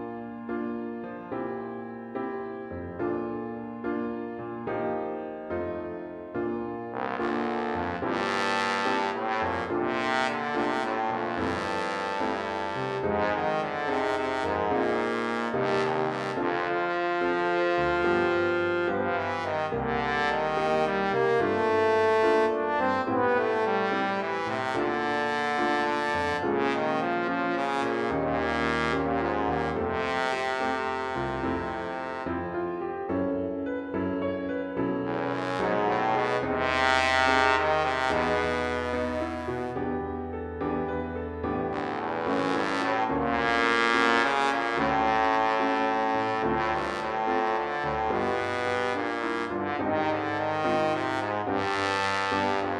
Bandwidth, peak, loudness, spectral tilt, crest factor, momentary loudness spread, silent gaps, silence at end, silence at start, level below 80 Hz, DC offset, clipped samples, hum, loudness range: 11.5 kHz; -6 dBFS; -27 LUFS; -5.5 dB/octave; 20 dB; 9 LU; none; 0 s; 0 s; -52 dBFS; under 0.1%; under 0.1%; none; 7 LU